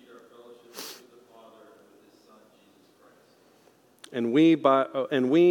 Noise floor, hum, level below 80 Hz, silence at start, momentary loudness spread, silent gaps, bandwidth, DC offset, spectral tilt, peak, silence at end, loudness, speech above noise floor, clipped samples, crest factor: -60 dBFS; none; -90 dBFS; 0.75 s; 22 LU; none; 18 kHz; under 0.1%; -6.5 dB/octave; -8 dBFS; 0 s; -23 LUFS; 39 dB; under 0.1%; 20 dB